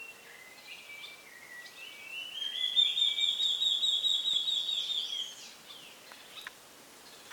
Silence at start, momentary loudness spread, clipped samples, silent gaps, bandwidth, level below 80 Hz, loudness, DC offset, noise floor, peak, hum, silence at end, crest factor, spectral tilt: 0 s; 23 LU; under 0.1%; none; 19 kHz; -84 dBFS; -28 LUFS; under 0.1%; -54 dBFS; -16 dBFS; none; 0 s; 18 dB; 2 dB/octave